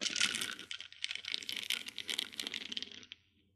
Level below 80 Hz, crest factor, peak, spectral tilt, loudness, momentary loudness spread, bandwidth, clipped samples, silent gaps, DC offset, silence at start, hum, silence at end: -82 dBFS; 28 dB; -12 dBFS; 1 dB/octave; -38 LUFS; 14 LU; 14 kHz; under 0.1%; none; under 0.1%; 0 s; none; 0.4 s